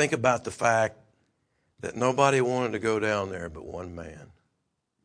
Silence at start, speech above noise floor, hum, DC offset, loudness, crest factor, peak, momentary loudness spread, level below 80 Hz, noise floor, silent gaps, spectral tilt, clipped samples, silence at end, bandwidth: 0 s; 52 dB; none; under 0.1%; -26 LUFS; 22 dB; -6 dBFS; 17 LU; -58 dBFS; -78 dBFS; none; -5 dB/octave; under 0.1%; 0.8 s; 10.5 kHz